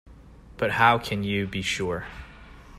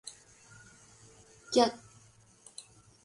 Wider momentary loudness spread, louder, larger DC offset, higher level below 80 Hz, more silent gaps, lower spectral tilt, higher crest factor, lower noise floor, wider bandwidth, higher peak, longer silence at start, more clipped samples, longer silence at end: second, 21 LU vs 28 LU; first, -25 LUFS vs -29 LUFS; neither; first, -48 dBFS vs -70 dBFS; neither; first, -4.5 dB/octave vs -3 dB/octave; second, 20 dB vs 26 dB; second, -48 dBFS vs -61 dBFS; first, 15.5 kHz vs 11.5 kHz; first, -6 dBFS vs -12 dBFS; about the same, 0.05 s vs 0.05 s; neither; second, 0 s vs 1.3 s